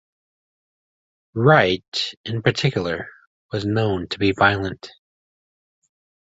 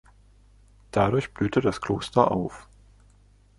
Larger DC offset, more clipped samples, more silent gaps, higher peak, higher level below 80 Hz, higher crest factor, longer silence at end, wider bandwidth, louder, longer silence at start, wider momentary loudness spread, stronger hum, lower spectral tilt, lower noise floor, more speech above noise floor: neither; neither; first, 1.88-1.92 s, 2.17-2.24 s, 3.27-3.49 s vs none; about the same, -2 dBFS vs -4 dBFS; about the same, -50 dBFS vs -50 dBFS; about the same, 22 dB vs 24 dB; first, 1.3 s vs 1 s; second, 8 kHz vs 11.5 kHz; first, -20 LUFS vs -25 LUFS; first, 1.35 s vs 0.95 s; first, 15 LU vs 8 LU; second, none vs 50 Hz at -45 dBFS; about the same, -6 dB/octave vs -7 dB/octave; first, under -90 dBFS vs -57 dBFS; first, over 70 dB vs 33 dB